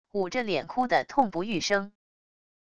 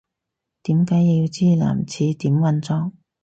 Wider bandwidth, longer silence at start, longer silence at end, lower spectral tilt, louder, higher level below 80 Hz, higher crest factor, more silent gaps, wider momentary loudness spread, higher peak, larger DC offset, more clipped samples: first, 11 kHz vs 8.2 kHz; second, 0.05 s vs 0.65 s; first, 0.7 s vs 0.35 s; second, -4 dB/octave vs -8 dB/octave; second, -27 LUFS vs -19 LUFS; second, -62 dBFS vs -54 dBFS; first, 20 dB vs 12 dB; neither; second, 5 LU vs 8 LU; about the same, -10 dBFS vs -8 dBFS; first, 0.4% vs under 0.1%; neither